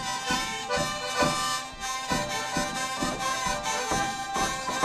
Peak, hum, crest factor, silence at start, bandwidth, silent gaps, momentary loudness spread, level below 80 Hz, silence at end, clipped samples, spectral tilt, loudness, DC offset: -10 dBFS; none; 20 dB; 0 s; 14 kHz; none; 4 LU; -48 dBFS; 0 s; under 0.1%; -2 dB/octave; -28 LUFS; under 0.1%